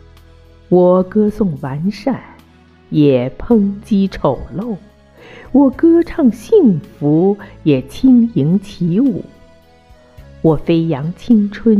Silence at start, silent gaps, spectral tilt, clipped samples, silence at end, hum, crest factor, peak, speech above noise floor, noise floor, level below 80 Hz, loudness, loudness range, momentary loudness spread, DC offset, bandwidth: 0.7 s; none; -9 dB/octave; under 0.1%; 0 s; none; 14 dB; 0 dBFS; 32 dB; -45 dBFS; -40 dBFS; -14 LUFS; 4 LU; 10 LU; under 0.1%; 12 kHz